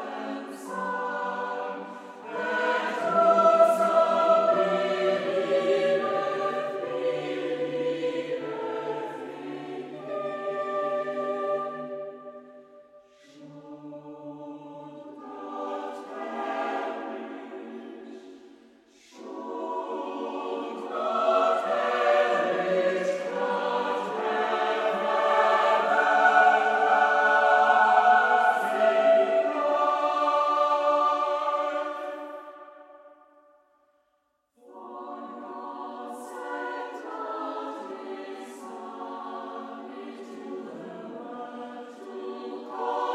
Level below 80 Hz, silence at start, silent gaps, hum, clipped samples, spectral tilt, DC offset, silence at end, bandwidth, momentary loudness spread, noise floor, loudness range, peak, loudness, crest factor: -86 dBFS; 0 s; none; none; under 0.1%; -4.5 dB/octave; under 0.1%; 0 s; 12.5 kHz; 20 LU; -73 dBFS; 18 LU; -6 dBFS; -25 LUFS; 20 dB